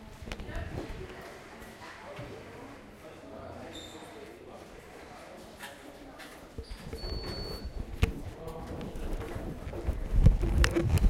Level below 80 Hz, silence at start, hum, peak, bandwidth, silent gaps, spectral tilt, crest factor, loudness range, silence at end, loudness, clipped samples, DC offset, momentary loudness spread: -36 dBFS; 0 s; none; -6 dBFS; 16.5 kHz; none; -6 dB/octave; 28 dB; 13 LU; 0 s; -36 LUFS; under 0.1%; under 0.1%; 20 LU